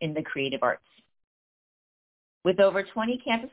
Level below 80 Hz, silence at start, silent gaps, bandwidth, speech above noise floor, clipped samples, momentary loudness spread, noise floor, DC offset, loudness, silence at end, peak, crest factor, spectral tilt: -66 dBFS; 0 s; 1.24-2.41 s; 4 kHz; over 63 dB; under 0.1%; 8 LU; under -90 dBFS; under 0.1%; -27 LUFS; 0.05 s; -8 dBFS; 20 dB; -9 dB/octave